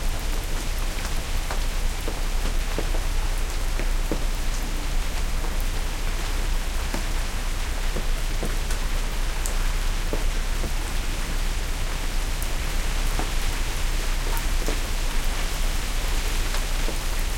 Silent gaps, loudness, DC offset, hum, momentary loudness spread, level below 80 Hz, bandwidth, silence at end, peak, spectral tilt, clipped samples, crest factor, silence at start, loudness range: none; -29 LUFS; under 0.1%; none; 2 LU; -24 dBFS; 17 kHz; 0 s; -8 dBFS; -3.5 dB/octave; under 0.1%; 16 dB; 0 s; 1 LU